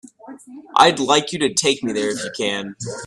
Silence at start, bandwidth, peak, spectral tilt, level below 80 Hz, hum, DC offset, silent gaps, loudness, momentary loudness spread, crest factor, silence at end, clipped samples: 0.25 s; 13.5 kHz; 0 dBFS; -2.5 dB/octave; -60 dBFS; none; under 0.1%; none; -18 LUFS; 11 LU; 20 dB; 0 s; under 0.1%